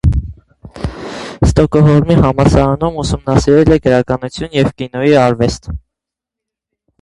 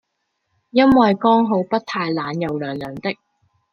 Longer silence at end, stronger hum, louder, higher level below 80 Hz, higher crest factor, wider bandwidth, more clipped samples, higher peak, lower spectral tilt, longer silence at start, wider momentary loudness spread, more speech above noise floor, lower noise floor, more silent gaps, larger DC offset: first, 1.25 s vs 0.6 s; neither; first, -12 LUFS vs -18 LUFS; first, -24 dBFS vs -54 dBFS; second, 12 dB vs 18 dB; first, 11.5 kHz vs 6.8 kHz; first, 0.1% vs under 0.1%; about the same, 0 dBFS vs -2 dBFS; about the same, -7 dB/octave vs -7.5 dB/octave; second, 0.05 s vs 0.75 s; first, 16 LU vs 13 LU; first, 71 dB vs 56 dB; first, -83 dBFS vs -73 dBFS; neither; neither